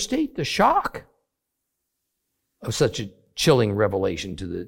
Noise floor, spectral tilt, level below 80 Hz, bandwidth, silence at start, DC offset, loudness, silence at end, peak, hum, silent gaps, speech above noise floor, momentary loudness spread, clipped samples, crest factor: -81 dBFS; -5 dB/octave; -50 dBFS; 17 kHz; 0 s; under 0.1%; -22 LUFS; 0 s; -4 dBFS; none; none; 58 dB; 14 LU; under 0.1%; 20 dB